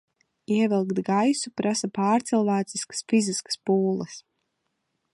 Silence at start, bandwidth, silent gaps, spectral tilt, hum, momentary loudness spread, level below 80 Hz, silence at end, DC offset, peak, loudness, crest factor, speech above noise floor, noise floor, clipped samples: 0.5 s; 11.5 kHz; none; -5 dB/octave; none; 7 LU; -74 dBFS; 0.95 s; under 0.1%; -12 dBFS; -25 LUFS; 14 dB; 53 dB; -77 dBFS; under 0.1%